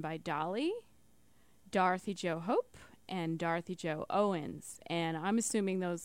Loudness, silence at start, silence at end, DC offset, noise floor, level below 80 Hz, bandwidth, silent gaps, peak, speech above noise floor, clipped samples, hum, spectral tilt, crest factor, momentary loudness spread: -35 LUFS; 0 s; 0 s; under 0.1%; -69 dBFS; -72 dBFS; 16.5 kHz; none; -18 dBFS; 34 dB; under 0.1%; none; -5 dB/octave; 18 dB; 11 LU